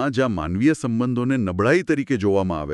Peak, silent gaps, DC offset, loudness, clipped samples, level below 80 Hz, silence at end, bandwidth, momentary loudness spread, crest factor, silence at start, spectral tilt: -4 dBFS; none; under 0.1%; -21 LUFS; under 0.1%; -46 dBFS; 0 s; 11.5 kHz; 3 LU; 16 dB; 0 s; -7 dB/octave